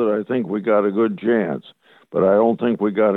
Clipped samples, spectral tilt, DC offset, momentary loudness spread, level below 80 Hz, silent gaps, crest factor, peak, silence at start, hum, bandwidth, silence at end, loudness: under 0.1%; -9.5 dB/octave; under 0.1%; 8 LU; -66 dBFS; none; 14 dB; -4 dBFS; 0 s; none; 4.1 kHz; 0 s; -19 LUFS